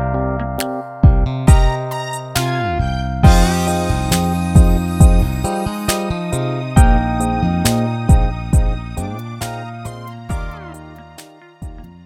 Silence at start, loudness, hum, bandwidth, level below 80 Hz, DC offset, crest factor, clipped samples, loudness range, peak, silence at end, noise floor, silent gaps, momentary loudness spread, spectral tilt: 0 s; -17 LUFS; none; 17.5 kHz; -18 dBFS; under 0.1%; 16 dB; under 0.1%; 6 LU; 0 dBFS; 0.05 s; -41 dBFS; none; 17 LU; -6 dB/octave